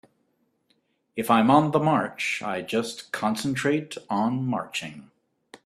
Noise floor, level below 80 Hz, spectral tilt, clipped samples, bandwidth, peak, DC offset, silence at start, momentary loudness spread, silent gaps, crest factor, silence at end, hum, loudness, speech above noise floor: -71 dBFS; -66 dBFS; -5.5 dB/octave; under 0.1%; 15 kHz; -4 dBFS; under 0.1%; 1.15 s; 13 LU; none; 22 dB; 0.1 s; none; -25 LUFS; 46 dB